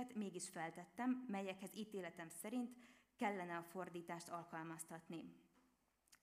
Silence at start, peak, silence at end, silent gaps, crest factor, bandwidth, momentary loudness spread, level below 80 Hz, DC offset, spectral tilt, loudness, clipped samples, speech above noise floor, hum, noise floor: 0 s; -30 dBFS; 0.05 s; none; 20 dB; 15.5 kHz; 9 LU; -90 dBFS; under 0.1%; -4.5 dB/octave; -49 LUFS; under 0.1%; 32 dB; none; -81 dBFS